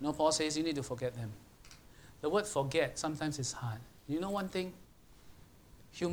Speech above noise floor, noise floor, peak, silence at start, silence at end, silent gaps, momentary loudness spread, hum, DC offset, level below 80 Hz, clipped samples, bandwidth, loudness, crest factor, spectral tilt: 24 dB; -59 dBFS; -18 dBFS; 0 s; 0 s; none; 22 LU; none; under 0.1%; -62 dBFS; under 0.1%; over 20 kHz; -36 LUFS; 20 dB; -4.5 dB/octave